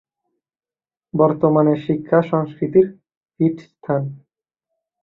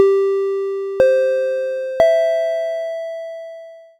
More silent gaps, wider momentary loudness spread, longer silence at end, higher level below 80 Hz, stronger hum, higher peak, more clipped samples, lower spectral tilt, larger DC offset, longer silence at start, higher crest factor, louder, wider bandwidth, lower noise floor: first, 3.17-3.21 s vs none; second, 8 LU vs 16 LU; first, 0.85 s vs 0.2 s; about the same, -60 dBFS vs -56 dBFS; neither; about the same, -2 dBFS vs 0 dBFS; neither; first, -11 dB/octave vs -5 dB/octave; neither; first, 1.15 s vs 0 s; about the same, 18 dB vs 18 dB; about the same, -19 LUFS vs -18 LUFS; second, 4.7 kHz vs 10.5 kHz; first, under -90 dBFS vs -37 dBFS